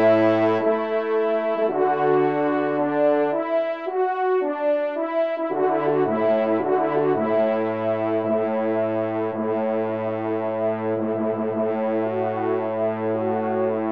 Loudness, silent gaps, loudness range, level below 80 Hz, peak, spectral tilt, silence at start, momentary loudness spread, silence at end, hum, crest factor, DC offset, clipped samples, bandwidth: -22 LUFS; none; 3 LU; -72 dBFS; -8 dBFS; -9 dB/octave; 0 s; 5 LU; 0 s; none; 14 dB; 0.2%; under 0.1%; 5.6 kHz